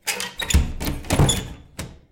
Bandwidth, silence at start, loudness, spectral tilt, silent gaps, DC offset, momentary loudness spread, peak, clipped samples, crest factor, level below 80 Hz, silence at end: 17 kHz; 0.05 s; -22 LUFS; -4 dB/octave; none; under 0.1%; 17 LU; -6 dBFS; under 0.1%; 16 dB; -28 dBFS; 0.15 s